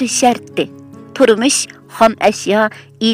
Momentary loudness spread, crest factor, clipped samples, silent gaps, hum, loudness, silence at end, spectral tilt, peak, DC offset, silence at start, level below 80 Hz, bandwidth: 11 LU; 14 dB; under 0.1%; none; none; -14 LUFS; 0 s; -3 dB/octave; 0 dBFS; under 0.1%; 0 s; -56 dBFS; 16 kHz